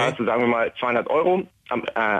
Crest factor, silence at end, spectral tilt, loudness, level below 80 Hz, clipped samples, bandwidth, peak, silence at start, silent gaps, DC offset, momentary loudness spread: 12 dB; 0 s; -6 dB/octave; -22 LUFS; -60 dBFS; under 0.1%; 9.6 kHz; -10 dBFS; 0 s; none; under 0.1%; 7 LU